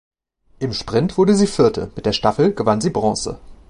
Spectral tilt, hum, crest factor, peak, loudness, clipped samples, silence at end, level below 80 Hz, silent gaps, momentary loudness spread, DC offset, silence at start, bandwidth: -5.5 dB/octave; none; 18 dB; -2 dBFS; -18 LUFS; under 0.1%; 0.15 s; -44 dBFS; none; 10 LU; under 0.1%; 0.6 s; 11 kHz